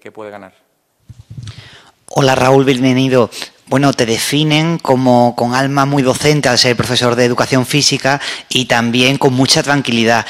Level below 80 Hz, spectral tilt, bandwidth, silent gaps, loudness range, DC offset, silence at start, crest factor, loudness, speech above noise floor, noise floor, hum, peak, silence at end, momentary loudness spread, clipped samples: -48 dBFS; -4.5 dB/octave; 16 kHz; none; 3 LU; under 0.1%; 0.05 s; 14 dB; -12 LUFS; 28 dB; -41 dBFS; none; 0 dBFS; 0 s; 9 LU; 0.2%